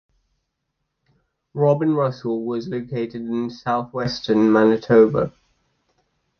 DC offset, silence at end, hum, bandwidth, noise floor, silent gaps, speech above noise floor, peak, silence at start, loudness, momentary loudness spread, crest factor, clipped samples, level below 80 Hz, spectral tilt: under 0.1%; 1.1 s; none; 6.6 kHz; -76 dBFS; none; 57 dB; -2 dBFS; 1.55 s; -20 LUFS; 12 LU; 18 dB; under 0.1%; -56 dBFS; -8 dB/octave